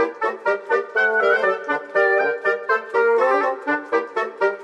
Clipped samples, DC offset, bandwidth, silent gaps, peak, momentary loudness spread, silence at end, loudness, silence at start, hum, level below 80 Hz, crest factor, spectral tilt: under 0.1%; under 0.1%; 9 kHz; none; -4 dBFS; 6 LU; 0 s; -20 LUFS; 0 s; none; -78 dBFS; 16 dB; -4 dB/octave